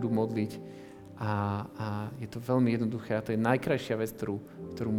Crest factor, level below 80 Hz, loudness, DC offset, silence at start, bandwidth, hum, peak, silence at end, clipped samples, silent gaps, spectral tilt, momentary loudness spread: 20 dB; -64 dBFS; -32 LUFS; under 0.1%; 0 s; 18 kHz; none; -10 dBFS; 0 s; under 0.1%; none; -7.5 dB/octave; 13 LU